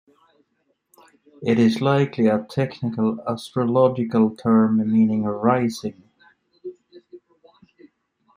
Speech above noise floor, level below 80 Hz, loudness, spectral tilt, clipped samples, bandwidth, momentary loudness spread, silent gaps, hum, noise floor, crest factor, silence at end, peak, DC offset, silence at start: 51 dB; -64 dBFS; -20 LUFS; -7.5 dB/octave; under 0.1%; 11 kHz; 14 LU; none; none; -70 dBFS; 18 dB; 1.2 s; -4 dBFS; under 0.1%; 1.4 s